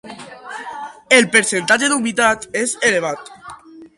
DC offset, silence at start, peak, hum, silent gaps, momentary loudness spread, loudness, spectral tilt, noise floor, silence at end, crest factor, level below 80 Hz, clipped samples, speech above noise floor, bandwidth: under 0.1%; 0.05 s; 0 dBFS; none; none; 20 LU; -15 LUFS; -2 dB/octave; -38 dBFS; 0.1 s; 18 dB; -58 dBFS; under 0.1%; 22 dB; 11.5 kHz